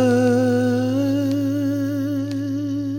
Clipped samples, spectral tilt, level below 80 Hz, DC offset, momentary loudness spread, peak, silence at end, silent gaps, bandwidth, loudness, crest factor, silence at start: under 0.1%; -7 dB/octave; -60 dBFS; under 0.1%; 7 LU; -8 dBFS; 0 s; none; 17 kHz; -21 LUFS; 12 dB; 0 s